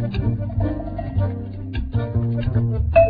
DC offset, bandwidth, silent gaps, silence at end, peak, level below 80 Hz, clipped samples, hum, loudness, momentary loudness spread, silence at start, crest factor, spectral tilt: under 0.1%; 4.9 kHz; none; 0 s; -2 dBFS; -30 dBFS; under 0.1%; none; -23 LUFS; 7 LU; 0 s; 18 dB; -11.5 dB/octave